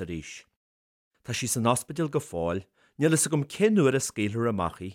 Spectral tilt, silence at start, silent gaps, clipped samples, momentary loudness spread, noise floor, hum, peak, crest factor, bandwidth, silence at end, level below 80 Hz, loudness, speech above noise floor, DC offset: -5 dB/octave; 0 s; 0.56-1.11 s; under 0.1%; 14 LU; under -90 dBFS; none; -10 dBFS; 18 dB; 16.5 kHz; 0 s; -56 dBFS; -27 LUFS; over 63 dB; under 0.1%